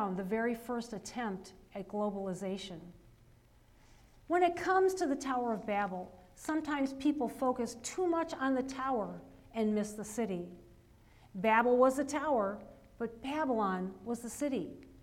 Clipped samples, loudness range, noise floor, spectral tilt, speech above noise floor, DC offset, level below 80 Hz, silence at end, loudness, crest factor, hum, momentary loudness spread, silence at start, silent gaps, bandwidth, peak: under 0.1%; 6 LU; -63 dBFS; -5 dB/octave; 29 dB; under 0.1%; -64 dBFS; 0.05 s; -34 LUFS; 20 dB; none; 15 LU; 0 s; none; 16.5 kHz; -14 dBFS